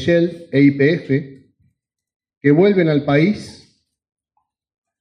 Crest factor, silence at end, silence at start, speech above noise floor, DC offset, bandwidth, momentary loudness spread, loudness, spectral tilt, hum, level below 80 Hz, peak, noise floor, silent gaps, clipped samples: 16 dB; 1.5 s; 0 s; 56 dB; under 0.1%; 10 kHz; 8 LU; -16 LUFS; -8 dB/octave; none; -62 dBFS; -2 dBFS; -71 dBFS; 2.16-2.20 s, 2.37-2.41 s; under 0.1%